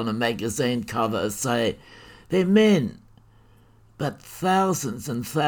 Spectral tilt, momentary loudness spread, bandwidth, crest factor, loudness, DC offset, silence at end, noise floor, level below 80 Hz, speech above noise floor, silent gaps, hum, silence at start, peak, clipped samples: -5 dB/octave; 13 LU; 19 kHz; 18 dB; -24 LUFS; under 0.1%; 0 s; -54 dBFS; -56 dBFS; 31 dB; none; none; 0 s; -6 dBFS; under 0.1%